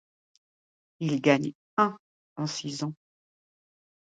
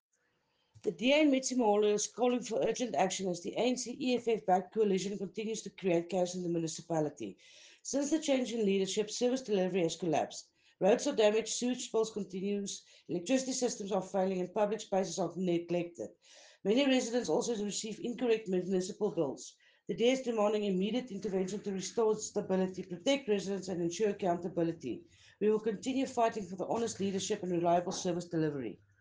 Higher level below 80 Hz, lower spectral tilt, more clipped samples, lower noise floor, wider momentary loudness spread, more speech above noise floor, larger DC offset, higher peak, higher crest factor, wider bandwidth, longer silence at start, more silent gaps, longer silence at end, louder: about the same, -76 dBFS vs -74 dBFS; about the same, -5.5 dB/octave vs -4.5 dB/octave; neither; first, under -90 dBFS vs -77 dBFS; about the same, 11 LU vs 9 LU; first, over 63 dB vs 45 dB; neither; first, -6 dBFS vs -14 dBFS; first, 24 dB vs 18 dB; about the same, 9.2 kHz vs 10 kHz; first, 1 s vs 0.85 s; first, 1.55-1.77 s, 1.99-2.36 s vs none; first, 1.1 s vs 0.25 s; first, -28 LUFS vs -33 LUFS